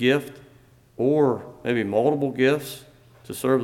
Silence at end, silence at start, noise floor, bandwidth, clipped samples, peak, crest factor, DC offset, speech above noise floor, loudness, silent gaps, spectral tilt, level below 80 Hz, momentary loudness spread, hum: 0 s; 0 s; -54 dBFS; 17 kHz; under 0.1%; -8 dBFS; 16 dB; under 0.1%; 32 dB; -23 LUFS; none; -6 dB/octave; -62 dBFS; 16 LU; none